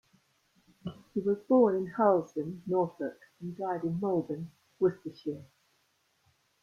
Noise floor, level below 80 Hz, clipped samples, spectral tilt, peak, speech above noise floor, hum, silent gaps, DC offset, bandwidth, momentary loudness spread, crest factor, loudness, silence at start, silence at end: -73 dBFS; -72 dBFS; under 0.1%; -9 dB/octave; -12 dBFS; 43 dB; none; none; under 0.1%; 7 kHz; 19 LU; 20 dB; -31 LUFS; 0.85 s; 1.2 s